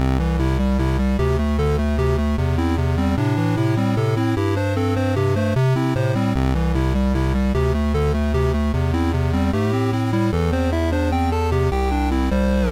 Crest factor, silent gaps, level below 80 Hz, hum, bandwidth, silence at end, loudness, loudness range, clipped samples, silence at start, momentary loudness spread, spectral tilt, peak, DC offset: 6 dB; none; -24 dBFS; none; 15.5 kHz; 0 s; -20 LUFS; 0 LU; under 0.1%; 0 s; 1 LU; -7.5 dB/octave; -12 dBFS; under 0.1%